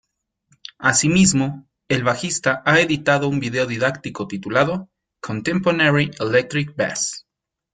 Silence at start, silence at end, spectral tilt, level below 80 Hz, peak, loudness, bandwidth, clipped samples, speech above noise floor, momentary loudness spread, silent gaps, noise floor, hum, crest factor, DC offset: 0.8 s; 0.55 s; -4 dB/octave; -54 dBFS; -2 dBFS; -19 LUFS; 9.6 kHz; under 0.1%; 45 dB; 14 LU; none; -65 dBFS; none; 18 dB; under 0.1%